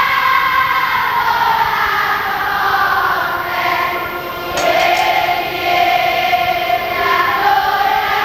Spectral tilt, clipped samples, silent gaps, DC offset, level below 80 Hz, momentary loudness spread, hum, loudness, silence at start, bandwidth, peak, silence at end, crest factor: -2.5 dB/octave; under 0.1%; none; 0.2%; -44 dBFS; 4 LU; none; -14 LUFS; 0 s; 18 kHz; 0 dBFS; 0 s; 14 dB